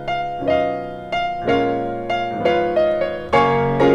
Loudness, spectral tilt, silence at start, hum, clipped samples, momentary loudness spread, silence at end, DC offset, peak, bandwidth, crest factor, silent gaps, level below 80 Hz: -20 LUFS; -7 dB/octave; 0 s; none; under 0.1%; 7 LU; 0 s; under 0.1%; -4 dBFS; 9.6 kHz; 16 dB; none; -42 dBFS